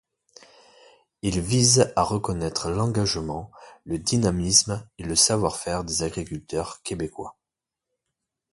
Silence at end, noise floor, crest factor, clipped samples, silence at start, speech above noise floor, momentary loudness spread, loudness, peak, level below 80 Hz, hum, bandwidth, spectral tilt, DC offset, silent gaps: 1.2 s; -87 dBFS; 24 dB; under 0.1%; 1.25 s; 63 dB; 15 LU; -23 LUFS; -2 dBFS; -44 dBFS; none; 11.5 kHz; -3.5 dB/octave; under 0.1%; none